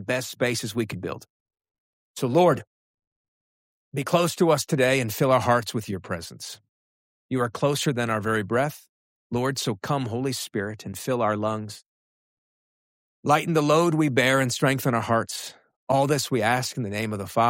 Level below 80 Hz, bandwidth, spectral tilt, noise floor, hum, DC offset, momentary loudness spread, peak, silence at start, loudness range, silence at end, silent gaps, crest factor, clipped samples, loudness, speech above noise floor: -62 dBFS; 16.5 kHz; -5 dB/octave; under -90 dBFS; none; under 0.1%; 13 LU; -8 dBFS; 0 s; 5 LU; 0 s; 1.30-1.46 s, 1.71-2.14 s, 2.67-2.98 s, 3.07-3.92 s, 6.69-7.29 s, 8.89-9.30 s, 11.86-13.23 s, 15.76-15.87 s; 18 dB; under 0.1%; -24 LUFS; over 66 dB